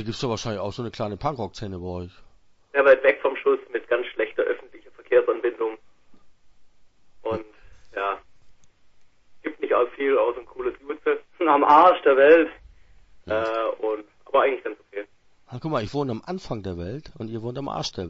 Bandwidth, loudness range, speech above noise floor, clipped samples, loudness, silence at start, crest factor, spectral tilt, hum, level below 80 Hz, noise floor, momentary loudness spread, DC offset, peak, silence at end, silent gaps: 7.8 kHz; 12 LU; 29 dB; under 0.1%; -23 LUFS; 0 s; 20 dB; -6 dB/octave; none; -54 dBFS; -51 dBFS; 19 LU; under 0.1%; -4 dBFS; 0 s; none